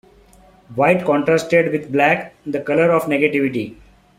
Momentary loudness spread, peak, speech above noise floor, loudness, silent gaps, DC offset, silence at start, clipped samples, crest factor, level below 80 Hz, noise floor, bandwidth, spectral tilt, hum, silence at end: 11 LU; -2 dBFS; 32 dB; -17 LUFS; none; under 0.1%; 0.7 s; under 0.1%; 16 dB; -56 dBFS; -49 dBFS; 15.5 kHz; -6.5 dB/octave; none; 0.45 s